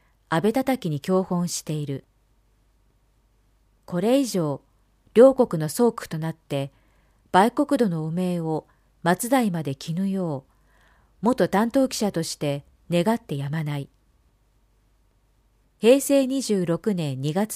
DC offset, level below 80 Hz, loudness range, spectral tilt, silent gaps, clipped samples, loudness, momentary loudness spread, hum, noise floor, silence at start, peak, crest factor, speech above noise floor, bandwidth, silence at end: under 0.1%; -60 dBFS; 7 LU; -6 dB/octave; none; under 0.1%; -23 LUFS; 12 LU; none; -63 dBFS; 0.3 s; -4 dBFS; 22 dB; 41 dB; 15.5 kHz; 0 s